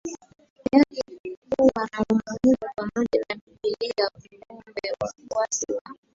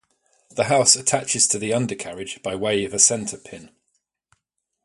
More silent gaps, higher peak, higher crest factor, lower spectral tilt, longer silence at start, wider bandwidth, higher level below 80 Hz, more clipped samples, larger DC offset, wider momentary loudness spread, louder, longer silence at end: first, 0.50-0.56 s, 1.20-1.24 s, 1.37-1.42 s, 3.41-3.47 s, 5.81-5.85 s vs none; about the same, -4 dBFS vs -2 dBFS; about the same, 22 dB vs 22 dB; first, -4 dB/octave vs -2 dB/octave; second, 0.05 s vs 0.55 s; second, 7.8 kHz vs 11.5 kHz; about the same, -56 dBFS vs -60 dBFS; neither; neither; second, 13 LU vs 16 LU; second, -25 LUFS vs -19 LUFS; second, 0.2 s vs 1.15 s